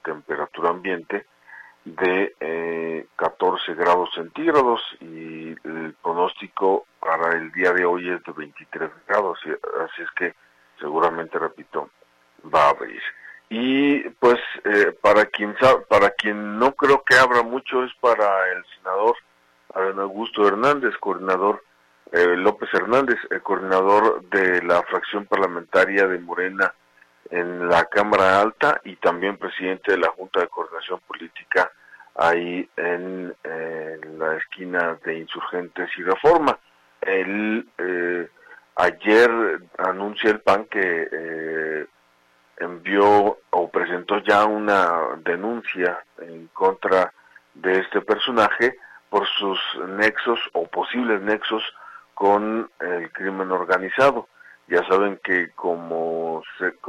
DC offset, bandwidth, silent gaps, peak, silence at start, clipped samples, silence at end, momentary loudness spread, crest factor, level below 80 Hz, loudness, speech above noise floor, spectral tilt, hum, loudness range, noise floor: under 0.1%; 12.5 kHz; none; -4 dBFS; 0.05 s; under 0.1%; 0 s; 13 LU; 18 dB; -60 dBFS; -21 LUFS; 38 dB; -5 dB/octave; none; 6 LU; -60 dBFS